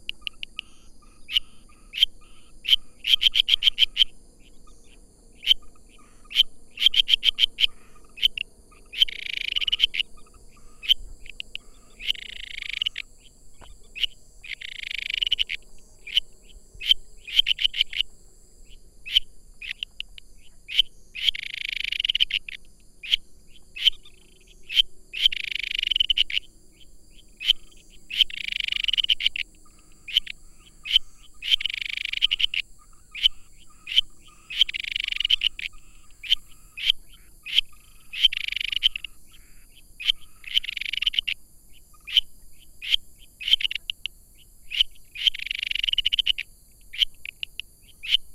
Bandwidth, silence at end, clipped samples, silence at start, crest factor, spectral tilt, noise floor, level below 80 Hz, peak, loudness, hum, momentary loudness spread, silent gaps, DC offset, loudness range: 16 kHz; 0 s; under 0.1%; 0 s; 24 dB; 1.5 dB/octave; -50 dBFS; -46 dBFS; -2 dBFS; -23 LUFS; none; 16 LU; none; under 0.1%; 6 LU